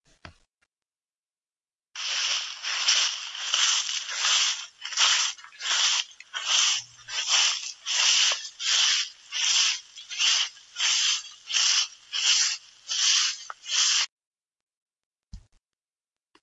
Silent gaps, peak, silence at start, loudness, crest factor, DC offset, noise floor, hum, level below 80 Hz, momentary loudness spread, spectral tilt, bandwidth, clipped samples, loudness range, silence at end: 1.15-1.23 s, 14.12-14.17 s, 14.26-14.32 s, 14.62-14.67 s, 14.77-14.86 s, 15.06-15.11 s; -6 dBFS; 0.25 s; -23 LUFS; 22 dB; under 0.1%; under -90 dBFS; none; -66 dBFS; 11 LU; 4.5 dB/octave; 11 kHz; under 0.1%; 4 LU; 1.05 s